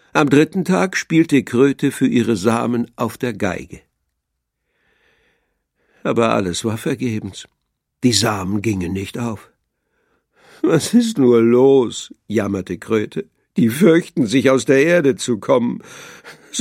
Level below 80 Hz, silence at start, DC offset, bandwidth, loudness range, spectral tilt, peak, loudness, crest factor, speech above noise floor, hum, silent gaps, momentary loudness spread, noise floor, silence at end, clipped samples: -56 dBFS; 0.15 s; under 0.1%; 16 kHz; 8 LU; -5.5 dB/octave; 0 dBFS; -17 LUFS; 18 dB; 59 dB; none; none; 14 LU; -76 dBFS; 0 s; under 0.1%